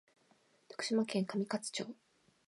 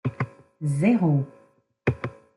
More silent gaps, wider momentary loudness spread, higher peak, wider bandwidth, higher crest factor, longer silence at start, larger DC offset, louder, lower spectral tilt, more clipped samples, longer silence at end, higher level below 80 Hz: neither; about the same, 15 LU vs 13 LU; second, -22 dBFS vs -8 dBFS; about the same, 11.5 kHz vs 11.5 kHz; about the same, 18 dB vs 18 dB; first, 0.7 s vs 0.05 s; neither; second, -37 LUFS vs -25 LUFS; second, -4.5 dB/octave vs -8.5 dB/octave; neither; first, 0.55 s vs 0.25 s; second, -88 dBFS vs -56 dBFS